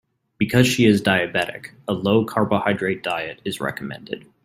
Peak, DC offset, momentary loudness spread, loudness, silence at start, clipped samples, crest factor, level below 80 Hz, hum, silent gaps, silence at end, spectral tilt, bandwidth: -2 dBFS; under 0.1%; 15 LU; -20 LUFS; 0.4 s; under 0.1%; 20 dB; -56 dBFS; none; none; 0.25 s; -5.5 dB/octave; 16 kHz